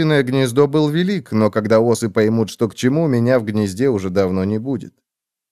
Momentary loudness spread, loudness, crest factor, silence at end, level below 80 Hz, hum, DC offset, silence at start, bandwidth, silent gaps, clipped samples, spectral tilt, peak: 6 LU; -17 LUFS; 16 dB; 0.6 s; -60 dBFS; none; 0.2%; 0 s; 14.5 kHz; none; under 0.1%; -6.5 dB/octave; -2 dBFS